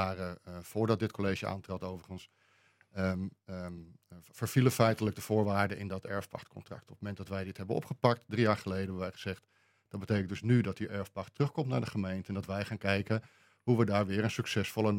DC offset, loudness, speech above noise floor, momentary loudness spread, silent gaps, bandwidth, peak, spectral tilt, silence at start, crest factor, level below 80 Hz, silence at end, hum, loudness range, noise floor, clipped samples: under 0.1%; -34 LUFS; 34 dB; 16 LU; none; 16.5 kHz; -10 dBFS; -6.5 dB/octave; 0 s; 24 dB; -68 dBFS; 0 s; none; 4 LU; -68 dBFS; under 0.1%